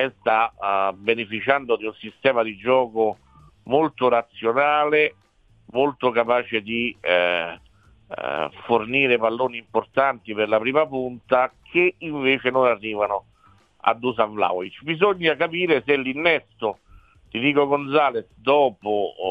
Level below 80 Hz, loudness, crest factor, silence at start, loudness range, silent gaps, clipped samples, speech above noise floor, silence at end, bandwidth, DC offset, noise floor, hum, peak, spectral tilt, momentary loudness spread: -60 dBFS; -22 LUFS; 22 dB; 0 s; 2 LU; none; under 0.1%; 35 dB; 0 s; 5 kHz; under 0.1%; -56 dBFS; none; 0 dBFS; -7 dB/octave; 8 LU